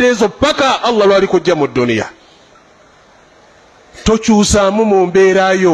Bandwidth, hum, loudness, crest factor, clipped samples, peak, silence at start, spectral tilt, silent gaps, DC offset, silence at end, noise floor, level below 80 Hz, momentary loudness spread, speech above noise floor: 12 kHz; none; -12 LUFS; 12 dB; under 0.1%; 0 dBFS; 0 s; -4.5 dB/octave; none; under 0.1%; 0 s; -45 dBFS; -36 dBFS; 6 LU; 34 dB